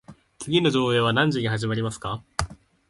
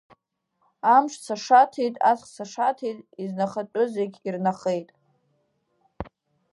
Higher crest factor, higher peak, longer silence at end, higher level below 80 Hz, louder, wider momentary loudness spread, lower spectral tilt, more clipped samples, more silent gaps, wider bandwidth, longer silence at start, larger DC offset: about the same, 20 dB vs 20 dB; about the same, -4 dBFS vs -6 dBFS; second, 0.35 s vs 0.5 s; first, -46 dBFS vs -58 dBFS; about the same, -24 LUFS vs -24 LUFS; second, 11 LU vs 17 LU; about the same, -5.5 dB/octave vs -5 dB/octave; neither; neither; about the same, 11.5 kHz vs 11.5 kHz; second, 0.1 s vs 0.85 s; neither